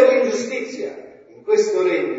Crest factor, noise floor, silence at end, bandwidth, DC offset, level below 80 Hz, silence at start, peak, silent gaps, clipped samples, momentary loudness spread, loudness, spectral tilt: 18 dB; -41 dBFS; 0 s; 7.8 kHz; under 0.1%; -74 dBFS; 0 s; -2 dBFS; none; under 0.1%; 16 LU; -20 LUFS; -3.5 dB/octave